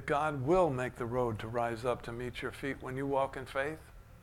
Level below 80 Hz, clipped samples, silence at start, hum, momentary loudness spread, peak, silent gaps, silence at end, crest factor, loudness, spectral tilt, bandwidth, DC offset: -54 dBFS; under 0.1%; 0 s; none; 10 LU; -16 dBFS; none; 0 s; 18 dB; -34 LUFS; -6.5 dB/octave; 16.5 kHz; under 0.1%